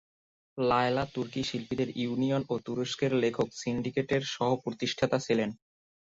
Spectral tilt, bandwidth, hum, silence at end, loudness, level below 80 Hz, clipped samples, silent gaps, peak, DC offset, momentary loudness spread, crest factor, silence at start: -5.5 dB/octave; 7.8 kHz; none; 0.6 s; -30 LUFS; -60 dBFS; under 0.1%; none; -12 dBFS; under 0.1%; 6 LU; 18 dB; 0.55 s